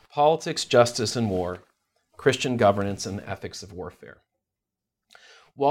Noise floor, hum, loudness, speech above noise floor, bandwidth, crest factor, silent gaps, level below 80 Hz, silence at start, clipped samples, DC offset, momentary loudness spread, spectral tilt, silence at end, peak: -86 dBFS; none; -24 LUFS; 62 dB; 16 kHz; 22 dB; none; -60 dBFS; 0.15 s; under 0.1%; under 0.1%; 17 LU; -4.5 dB/octave; 0 s; -4 dBFS